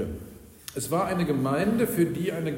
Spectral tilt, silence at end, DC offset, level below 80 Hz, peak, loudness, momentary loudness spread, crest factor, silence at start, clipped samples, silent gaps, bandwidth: -6 dB/octave; 0 s; under 0.1%; -52 dBFS; -12 dBFS; -26 LUFS; 16 LU; 14 dB; 0 s; under 0.1%; none; 16.5 kHz